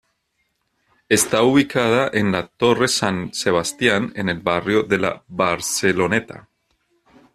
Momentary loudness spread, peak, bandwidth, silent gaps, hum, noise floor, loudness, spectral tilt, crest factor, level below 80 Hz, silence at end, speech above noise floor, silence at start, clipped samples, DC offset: 7 LU; -2 dBFS; 14 kHz; none; none; -70 dBFS; -19 LUFS; -4 dB/octave; 18 dB; -54 dBFS; 0.95 s; 51 dB; 1.1 s; under 0.1%; under 0.1%